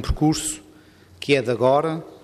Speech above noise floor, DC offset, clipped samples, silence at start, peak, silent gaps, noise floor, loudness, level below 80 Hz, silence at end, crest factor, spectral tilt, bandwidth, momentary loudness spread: 29 dB; under 0.1%; under 0.1%; 0 s; -6 dBFS; none; -50 dBFS; -21 LUFS; -38 dBFS; 0.05 s; 16 dB; -5 dB/octave; 15 kHz; 12 LU